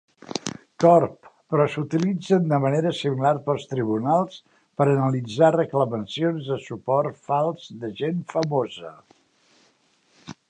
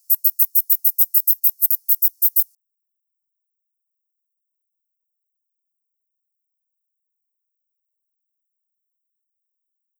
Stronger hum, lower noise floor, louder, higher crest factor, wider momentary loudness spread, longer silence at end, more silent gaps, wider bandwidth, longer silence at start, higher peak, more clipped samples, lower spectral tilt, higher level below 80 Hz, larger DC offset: neither; second, -63 dBFS vs -80 dBFS; second, -23 LUFS vs -15 LUFS; about the same, 20 dB vs 22 dB; first, 13 LU vs 3 LU; second, 0.15 s vs 7.55 s; neither; second, 9.6 kHz vs over 20 kHz; first, 0.25 s vs 0.1 s; about the same, -4 dBFS vs -2 dBFS; neither; first, -7 dB/octave vs 9 dB/octave; first, -66 dBFS vs under -90 dBFS; neither